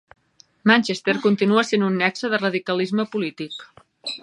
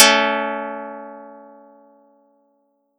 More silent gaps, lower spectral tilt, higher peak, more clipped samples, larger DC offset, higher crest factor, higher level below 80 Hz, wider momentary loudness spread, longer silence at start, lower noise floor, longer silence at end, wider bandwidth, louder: neither; first, -5 dB/octave vs -0.5 dB/octave; about the same, -2 dBFS vs 0 dBFS; neither; neither; about the same, 20 dB vs 22 dB; first, -70 dBFS vs -86 dBFS; second, 15 LU vs 25 LU; first, 0.65 s vs 0 s; second, -47 dBFS vs -65 dBFS; second, 0.05 s vs 1.65 s; second, 10.5 kHz vs 18 kHz; about the same, -21 LUFS vs -19 LUFS